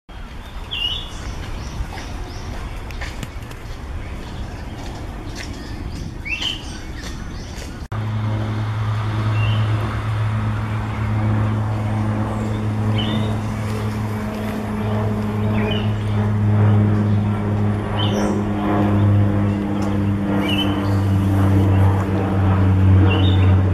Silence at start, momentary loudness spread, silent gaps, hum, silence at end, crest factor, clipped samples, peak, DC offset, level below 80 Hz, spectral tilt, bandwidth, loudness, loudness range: 0.1 s; 15 LU; none; none; 0 s; 14 dB; under 0.1%; -4 dBFS; under 0.1%; -34 dBFS; -7 dB/octave; 12 kHz; -20 LUFS; 13 LU